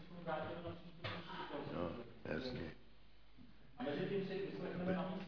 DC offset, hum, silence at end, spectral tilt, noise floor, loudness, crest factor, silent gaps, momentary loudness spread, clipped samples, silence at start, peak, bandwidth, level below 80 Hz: 0.1%; none; 0 s; -5 dB/octave; -67 dBFS; -45 LUFS; 18 dB; none; 16 LU; under 0.1%; 0 s; -28 dBFS; 5.4 kHz; -66 dBFS